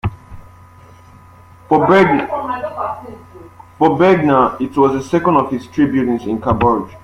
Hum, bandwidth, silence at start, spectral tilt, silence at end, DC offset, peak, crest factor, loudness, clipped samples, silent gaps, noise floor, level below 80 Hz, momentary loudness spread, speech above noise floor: none; 11.5 kHz; 0.05 s; -7.5 dB/octave; 0.05 s; under 0.1%; 0 dBFS; 16 dB; -15 LUFS; under 0.1%; none; -42 dBFS; -42 dBFS; 12 LU; 29 dB